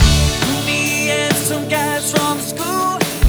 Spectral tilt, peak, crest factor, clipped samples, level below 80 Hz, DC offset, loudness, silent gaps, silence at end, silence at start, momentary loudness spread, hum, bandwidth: -3.5 dB/octave; 0 dBFS; 16 dB; under 0.1%; -24 dBFS; under 0.1%; -16 LUFS; none; 0 s; 0 s; 4 LU; none; over 20 kHz